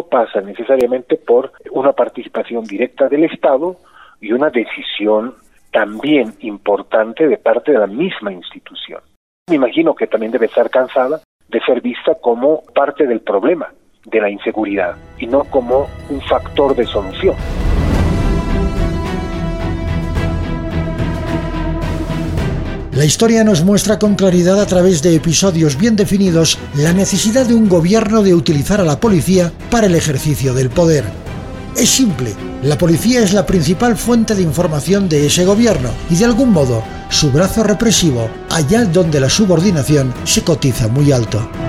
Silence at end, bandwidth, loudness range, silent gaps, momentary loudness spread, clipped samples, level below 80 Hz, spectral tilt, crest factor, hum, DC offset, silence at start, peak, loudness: 0 s; 16 kHz; 5 LU; 9.16-9.46 s, 11.25-11.40 s; 9 LU; under 0.1%; -28 dBFS; -5 dB/octave; 14 dB; none; 0.1%; 0 s; 0 dBFS; -14 LUFS